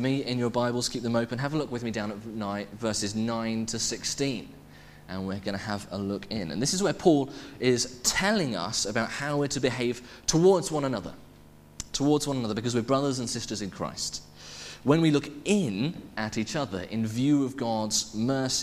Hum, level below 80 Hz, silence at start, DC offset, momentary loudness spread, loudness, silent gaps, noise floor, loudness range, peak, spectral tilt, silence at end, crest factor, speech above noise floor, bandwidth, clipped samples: none; -54 dBFS; 0 s; under 0.1%; 10 LU; -28 LUFS; none; -52 dBFS; 5 LU; -8 dBFS; -4.5 dB/octave; 0 s; 20 dB; 24 dB; 15.5 kHz; under 0.1%